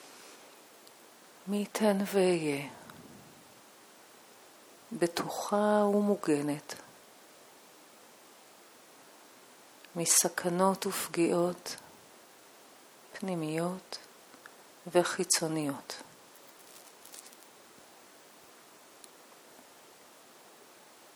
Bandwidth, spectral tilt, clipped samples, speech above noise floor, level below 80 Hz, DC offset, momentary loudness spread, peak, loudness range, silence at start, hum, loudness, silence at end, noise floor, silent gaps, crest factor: over 20 kHz; -3.5 dB/octave; under 0.1%; 26 dB; -82 dBFS; under 0.1%; 27 LU; -12 dBFS; 22 LU; 0 s; none; -30 LUFS; 3.85 s; -57 dBFS; none; 24 dB